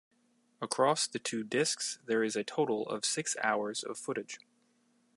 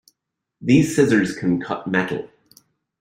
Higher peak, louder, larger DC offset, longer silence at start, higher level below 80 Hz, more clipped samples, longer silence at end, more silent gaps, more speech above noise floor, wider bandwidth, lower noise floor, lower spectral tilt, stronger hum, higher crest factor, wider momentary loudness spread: second, -12 dBFS vs -2 dBFS; second, -33 LUFS vs -20 LUFS; neither; about the same, 0.6 s vs 0.6 s; second, -86 dBFS vs -56 dBFS; neither; about the same, 0.8 s vs 0.75 s; neither; second, 38 dB vs 62 dB; second, 11.5 kHz vs 16 kHz; second, -71 dBFS vs -80 dBFS; second, -2.5 dB/octave vs -6 dB/octave; neither; about the same, 22 dB vs 18 dB; second, 9 LU vs 13 LU